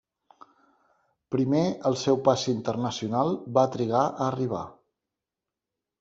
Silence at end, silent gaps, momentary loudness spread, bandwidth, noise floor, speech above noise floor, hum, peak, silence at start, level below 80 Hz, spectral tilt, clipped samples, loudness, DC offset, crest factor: 1.3 s; none; 7 LU; 7.8 kHz; -88 dBFS; 63 dB; none; -6 dBFS; 1.3 s; -66 dBFS; -6 dB/octave; under 0.1%; -26 LUFS; under 0.1%; 22 dB